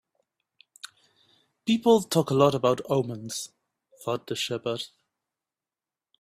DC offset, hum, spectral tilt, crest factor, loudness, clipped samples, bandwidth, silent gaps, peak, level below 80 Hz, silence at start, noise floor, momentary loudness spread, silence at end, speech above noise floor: under 0.1%; none; -5 dB/octave; 22 dB; -26 LUFS; under 0.1%; 15.5 kHz; none; -6 dBFS; -68 dBFS; 0.85 s; under -90 dBFS; 21 LU; 1.35 s; over 65 dB